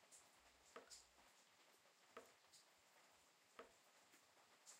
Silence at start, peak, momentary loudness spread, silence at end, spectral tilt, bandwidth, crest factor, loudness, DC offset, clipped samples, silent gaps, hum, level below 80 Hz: 0 s; -46 dBFS; 7 LU; 0 s; -0.5 dB/octave; 15.5 kHz; 24 dB; -66 LUFS; under 0.1%; under 0.1%; none; none; under -90 dBFS